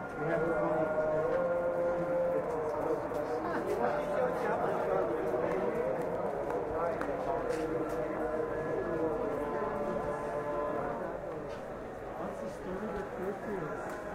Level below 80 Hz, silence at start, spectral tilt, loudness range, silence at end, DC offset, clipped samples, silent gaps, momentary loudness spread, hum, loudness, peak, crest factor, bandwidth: -56 dBFS; 0 s; -7 dB/octave; 5 LU; 0 s; under 0.1%; under 0.1%; none; 8 LU; none; -34 LUFS; -18 dBFS; 16 dB; 15.5 kHz